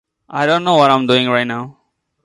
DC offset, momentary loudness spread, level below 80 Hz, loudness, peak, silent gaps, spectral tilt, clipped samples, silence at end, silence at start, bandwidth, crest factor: under 0.1%; 15 LU; -60 dBFS; -14 LUFS; 0 dBFS; none; -5.5 dB/octave; under 0.1%; 0.55 s; 0.3 s; 11.5 kHz; 16 dB